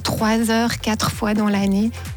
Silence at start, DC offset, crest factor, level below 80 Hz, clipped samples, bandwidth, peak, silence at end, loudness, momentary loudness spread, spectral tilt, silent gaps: 0 s; under 0.1%; 12 dB; -40 dBFS; under 0.1%; 19 kHz; -8 dBFS; 0 s; -19 LUFS; 3 LU; -5 dB/octave; none